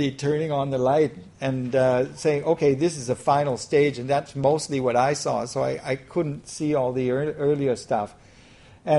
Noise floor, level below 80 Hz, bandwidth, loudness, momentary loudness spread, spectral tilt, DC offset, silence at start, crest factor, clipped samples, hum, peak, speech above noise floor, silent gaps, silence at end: -50 dBFS; -56 dBFS; 11.5 kHz; -24 LUFS; 6 LU; -6 dB/octave; under 0.1%; 0 s; 16 dB; under 0.1%; none; -8 dBFS; 27 dB; none; 0 s